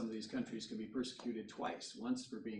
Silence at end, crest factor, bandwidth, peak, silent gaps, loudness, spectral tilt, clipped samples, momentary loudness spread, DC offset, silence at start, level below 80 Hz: 0 s; 16 dB; 10.5 kHz; -28 dBFS; none; -44 LUFS; -4.5 dB/octave; under 0.1%; 3 LU; under 0.1%; 0 s; -78 dBFS